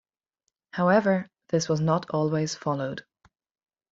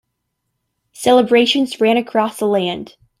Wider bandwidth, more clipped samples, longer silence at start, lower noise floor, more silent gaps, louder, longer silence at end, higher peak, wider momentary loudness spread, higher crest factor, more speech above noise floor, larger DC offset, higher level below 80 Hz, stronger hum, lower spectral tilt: second, 7.8 kHz vs 15.5 kHz; neither; second, 0.75 s vs 1 s; first, -81 dBFS vs -74 dBFS; neither; second, -26 LUFS vs -15 LUFS; first, 0.9 s vs 0.35 s; second, -8 dBFS vs -2 dBFS; about the same, 11 LU vs 9 LU; about the same, 20 dB vs 16 dB; about the same, 56 dB vs 59 dB; neither; second, -66 dBFS vs -60 dBFS; neither; first, -6 dB/octave vs -4.5 dB/octave